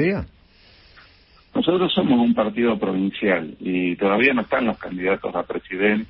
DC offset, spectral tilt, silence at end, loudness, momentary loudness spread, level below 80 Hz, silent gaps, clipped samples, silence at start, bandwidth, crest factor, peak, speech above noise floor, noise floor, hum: under 0.1%; -11 dB/octave; 0.05 s; -21 LUFS; 9 LU; -50 dBFS; none; under 0.1%; 0 s; 5.6 kHz; 18 dB; -4 dBFS; 32 dB; -53 dBFS; none